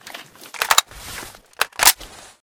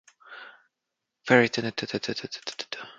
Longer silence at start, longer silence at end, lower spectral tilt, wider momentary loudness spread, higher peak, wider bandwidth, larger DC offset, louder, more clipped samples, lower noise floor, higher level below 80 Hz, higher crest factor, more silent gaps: second, 0.05 s vs 0.3 s; first, 0.45 s vs 0.05 s; second, 1.5 dB/octave vs -4.5 dB/octave; about the same, 23 LU vs 24 LU; first, 0 dBFS vs -4 dBFS; first, over 20 kHz vs 7.8 kHz; neither; first, -17 LUFS vs -26 LUFS; neither; second, -39 dBFS vs -84 dBFS; first, -50 dBFS vs -70 dBFS; about the same, 22 dB vs 26 dB; neither